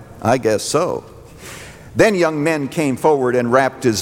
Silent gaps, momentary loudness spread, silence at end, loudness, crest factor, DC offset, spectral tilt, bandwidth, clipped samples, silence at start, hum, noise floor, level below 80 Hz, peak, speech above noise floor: none; 19 LU; 0 s; -17 LUFS; 16 dB; under 0.1%; -5 dB/octave; 17 kHz; under 0.1%; 0 s; none; -36 dBFS; -48 dBFS; -2 dBFS; 20 dB